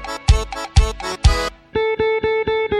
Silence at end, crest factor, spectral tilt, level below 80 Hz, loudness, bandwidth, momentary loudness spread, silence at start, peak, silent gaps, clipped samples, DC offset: 0 s; 18 dB; -5 dB/octave; -22 dBFS; -19 LUFS; 13 kHz; 5 LU; 0 s; 0 dBFS; none; under 0.1%; under 0.1%